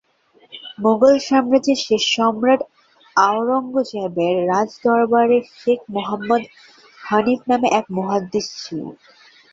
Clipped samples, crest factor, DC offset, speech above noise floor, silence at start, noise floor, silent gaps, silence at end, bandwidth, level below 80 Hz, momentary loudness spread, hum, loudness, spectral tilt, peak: under 0.1%; 16 dB; under 0.1%; 38 dB; 0.55 s; -56 dBFS; none; 0.6 s; 7.8 kHz; -62 dBFS; 13 LU; none; -18 LUFS; -4.5 dB/octave; -2 dBFS